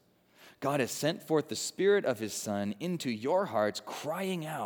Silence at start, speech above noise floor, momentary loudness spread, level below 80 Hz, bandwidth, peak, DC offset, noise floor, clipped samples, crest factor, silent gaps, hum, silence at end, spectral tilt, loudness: 0.4 s; 29 dB; 8 LU; -80 dBFS; over 20 kHz; -14 dBFS; under 0.1%; -60 dBFS; under 0.1%; 18 dB; none; none; 0 s; -4.5 dB/octave; -32 LUFS